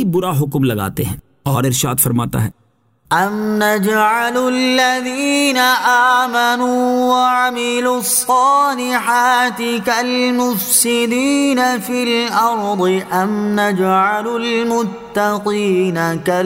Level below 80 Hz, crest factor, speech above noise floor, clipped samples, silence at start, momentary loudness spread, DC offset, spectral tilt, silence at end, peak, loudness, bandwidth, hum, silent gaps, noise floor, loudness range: -50 dBFS; 14 dB; 41 dB; under 0.1%; 0 s; 6 LU; under 0.1%; -4 dB/octave; 0 s; 0 dBFS; -15 LUFS; 16.5 kHz; none; none; -56 dBFS; 3 LU